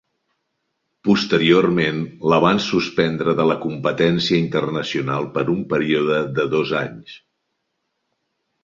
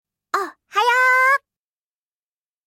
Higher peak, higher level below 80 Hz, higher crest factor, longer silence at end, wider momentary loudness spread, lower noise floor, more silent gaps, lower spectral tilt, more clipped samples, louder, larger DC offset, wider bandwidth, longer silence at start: first, -2 dBFS vs -6 dBFS; first, -56 dBFS vs -82 dBFS; about the same, 18 dB vs 16 dB; first, 1.45 s vs 1.3 s; second, 7 LU vs 11 LU; second, -74 dBFS vs under -90 dBFS; neither; first, -6 dB/octave vs 1 dB/octave; neither; about the same, -19 LUFS vs -18 LUFS; neither; second, 7.6 kHz vs 16.5 kHz; first, 1.05 s vs 0.35 s